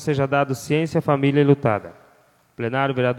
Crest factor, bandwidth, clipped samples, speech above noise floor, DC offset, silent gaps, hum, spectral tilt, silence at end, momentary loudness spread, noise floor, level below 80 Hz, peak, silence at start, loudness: 18 dB; 14 kHz; under 0.1%; 38 dB; under 0.1%; none; none; -7 dB/octave; 0 s; 8 LU; -57 dBFS; -58 dBFS; -4 dBFS; 0 s; -21 LUFS